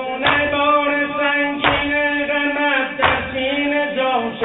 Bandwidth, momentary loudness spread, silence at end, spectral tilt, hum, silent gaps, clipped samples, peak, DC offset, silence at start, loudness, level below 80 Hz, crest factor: 4.1 kHz; 3 LU; 0 s; -9 dB/octave; none; none; under 0.1%; 0 dBFS; under 0.1%; 0 s; -17 LUFS; -46 dBFS; 18 dB